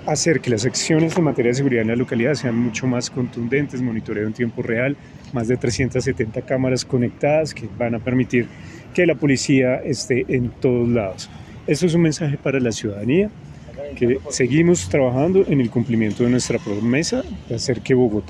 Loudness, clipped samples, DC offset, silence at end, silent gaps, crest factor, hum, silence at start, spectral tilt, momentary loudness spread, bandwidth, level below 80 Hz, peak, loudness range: -20 LUFS; under 0.1%; under 0.1%; 0 s; none; 16 dB; none; 0 s; -5.5 dB/octave; 9 LU; 12 kHz; -48 dBFS; -4 dBFS; 4 LU